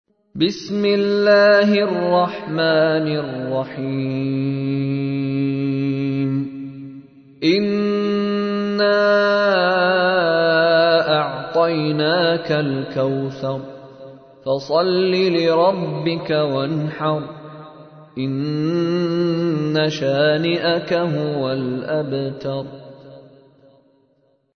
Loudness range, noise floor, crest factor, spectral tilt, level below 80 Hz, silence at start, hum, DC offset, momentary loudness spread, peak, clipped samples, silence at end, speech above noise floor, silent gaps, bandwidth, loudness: 6 LU; -62 dBFS; 16 dB; -7 dB/octave; -62 dBFS; 0.35 s; none; under 0.1%; 11 LU; -2 dBFS; under 0.1%; 1.35 s; 43 dB; none; 6.6 kHz; -19 LUFS